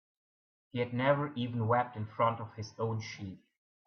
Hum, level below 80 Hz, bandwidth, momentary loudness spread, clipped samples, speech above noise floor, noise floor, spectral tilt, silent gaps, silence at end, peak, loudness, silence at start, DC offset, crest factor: none; -74 dBFS; 6.6 kHz; 13 LU; under 0.1%; over 57 dB; under -90 dBFS; -7 dB/octave; none; 0.5 s; -14 dBFS; -34 LUFS; 0.75 s; under 0.1%; 20 dB